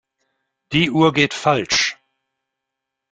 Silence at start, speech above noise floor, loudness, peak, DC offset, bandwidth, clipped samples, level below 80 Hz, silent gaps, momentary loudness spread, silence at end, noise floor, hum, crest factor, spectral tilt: 0.7 s; 64 dB; -17 LUFS; -2 dBFS; under 0.1%; 9.2 kHz; under 0.1%; -54 dBFS; none; 6 LU; 1.2 s; -81 dBFS; none; 20 dB; -4 dB/octave